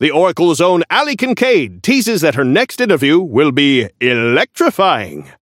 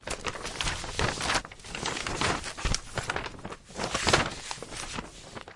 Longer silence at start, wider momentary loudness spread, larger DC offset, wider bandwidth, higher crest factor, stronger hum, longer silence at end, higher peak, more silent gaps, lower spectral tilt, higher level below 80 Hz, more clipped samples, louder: about the same, 0 s vs 0 s; second, 3 LU vs 14 LU; neither; first, 16.5 kHz vs 11.5 kHz; second, 12 dB vs 26 dB; neither; first, 0.2 s vs 0 s; first, 0 dBFS vs -6 dBFS; neither; first, -4.5 dB/octave vs -2.5 dB/octave; second, -60 dBFS vs -42 dBFS; neither; first, -13 LUFS vs -31 LUFS